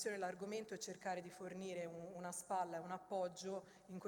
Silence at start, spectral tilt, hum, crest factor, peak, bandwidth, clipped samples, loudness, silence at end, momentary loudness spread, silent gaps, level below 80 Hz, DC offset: 0 s; -4 dB/octave; none; 16 dB; -30 dBFS; 18 kHz; under 0.1%; -47 LUFS; 0 s; 7 LU; none; -86 dBFS; under 0.1%